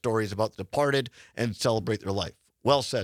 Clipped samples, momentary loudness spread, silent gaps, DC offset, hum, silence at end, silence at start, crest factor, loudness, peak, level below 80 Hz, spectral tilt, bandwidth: under 0.1%; 7 LU; none; under 0.1%; none; 0 s; 0.05 s; 22 dB; -28 LUFS; -6 dBFS; -60 dBFS; -5 dB/octave; 16 kHz